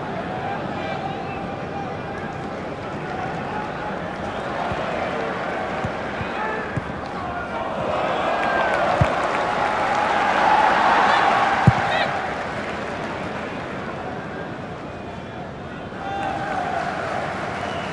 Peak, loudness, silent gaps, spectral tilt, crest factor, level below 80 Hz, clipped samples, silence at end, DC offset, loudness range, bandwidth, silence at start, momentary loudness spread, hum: 0 dBFS; -23 LUFS; none; -5.5 dB/octave; 22 dB; -46 dBFS; under 0.1%; 0 s; under 0.1%; 11 LU; 11.5 kHz; 0 s; 13 LU; none